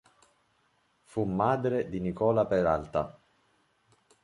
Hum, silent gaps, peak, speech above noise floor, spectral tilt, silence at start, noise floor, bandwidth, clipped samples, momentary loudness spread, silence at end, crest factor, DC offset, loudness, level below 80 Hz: none; none; -12 dBFS; 43 dB; -8.5 dB/octave; 1.15 s; -71 dBFS; 11.5 kHz; under 0.1%; 8 LU; 1.1 s; 20 dB; under 0.1%; -29 LUFS; -54 dBFS